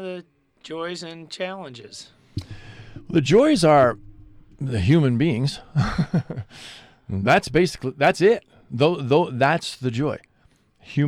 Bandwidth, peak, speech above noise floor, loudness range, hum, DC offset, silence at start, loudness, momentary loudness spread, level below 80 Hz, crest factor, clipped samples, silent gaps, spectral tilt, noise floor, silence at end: 13.5 kHz; -6 dBFS; 39 dB; 4 LU; none; under 0.1%; 0 s; -21 LUFS; 22 LU; -46 dBFS; 16 dB; under 0.1%; none; -6.5 dB/octave; -60 dBFS; 0 s